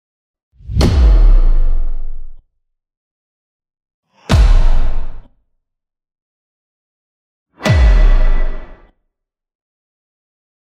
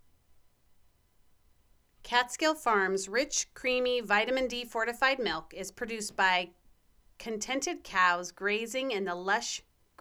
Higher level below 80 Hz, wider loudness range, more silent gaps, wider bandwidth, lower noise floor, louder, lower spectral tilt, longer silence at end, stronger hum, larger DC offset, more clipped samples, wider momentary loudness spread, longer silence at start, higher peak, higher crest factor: first, -14 dBFS vs -62 dBFS; about the same, 4 LU vs 3 LU; first, 2.97-3.60 s, 3.94-4.03 s, 6.22-7.46 s vs none; second, 8.6 kHz vs 19 kHz; first, -72 dBFS vs -65 dBFS; first, -15 LUFS vs -30 LUFS; first, -6.5 dB/octave vs -1.5 dB/octave; first, 1.95 s vs 0.4 s; neither; neither; neither; first, 19 LU vs 10 LU; second, 0.65 s vs 2.05 s; first, 0 dBFS vs -10 dBFS; second, 14 dB vs 22 dB